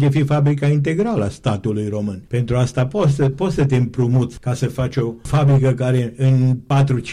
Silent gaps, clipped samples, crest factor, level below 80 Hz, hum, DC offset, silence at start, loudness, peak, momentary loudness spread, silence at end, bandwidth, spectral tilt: none; under 0.1%; 8 dB; -42 dBFS; none; under 0.1%; 0 s; -18 LUFS; -8 dBFS; 7 LU; 0 s; 10.5 kHz; -8 dB/octave